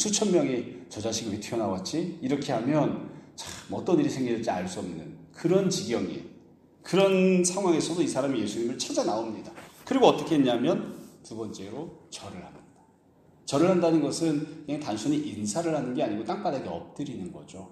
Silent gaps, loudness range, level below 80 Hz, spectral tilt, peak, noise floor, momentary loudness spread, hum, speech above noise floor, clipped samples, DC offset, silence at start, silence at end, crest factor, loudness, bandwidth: none; 4 LU; -66 dBFS; -5 dB/octave; -4 dBFS; -59 dBFS; 18 LU; none; 32 dB; under 0.1%; under 0.1%; 0 s; 0 s; 24 dB; -27 LUFS; 13.5 kHz